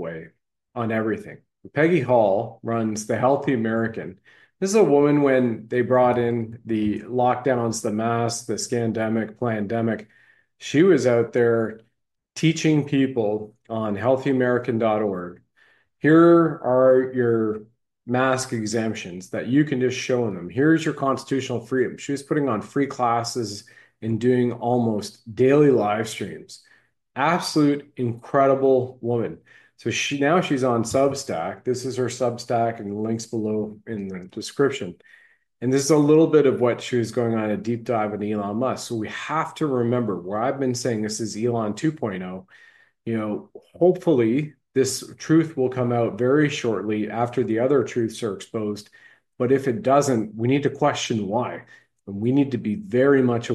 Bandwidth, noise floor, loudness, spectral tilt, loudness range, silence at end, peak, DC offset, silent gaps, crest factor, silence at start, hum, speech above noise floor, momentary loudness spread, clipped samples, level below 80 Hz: 12.5 kHz; -61 dBFS; -22 LUFS; -6 dB/octave; 5 LU; 0 s; -4 dBFS; under 0.1%; none; 18 dB; 0 s; none; 39 dB; 12 LU; under 0.1%; -64 dBFS